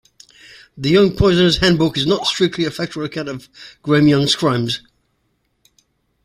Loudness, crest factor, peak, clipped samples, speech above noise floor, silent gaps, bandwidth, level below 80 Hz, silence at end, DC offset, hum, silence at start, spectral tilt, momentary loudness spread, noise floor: -16 LUFS; 16 dB; -2 dBFS; under 0.1%; 50 dB; none; 15.5 kHz; -40 dBFS; 1.45 s; under 0.1%; none; 0.75 s; -5.5 dB/octave; 13 LU; -67 dBFS